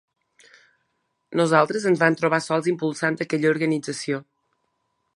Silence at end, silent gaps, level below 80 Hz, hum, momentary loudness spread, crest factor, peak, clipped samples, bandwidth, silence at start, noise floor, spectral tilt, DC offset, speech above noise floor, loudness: 0.95 s; none; -74 dBFS; none; 9 LU; 22 dB; -2 dBFS; under 0.1%; 11.5 kHz; 1.3 s; -74 dBFS; -5.5 dB/octave; under 0.1%; 52 dB; -22 LUFS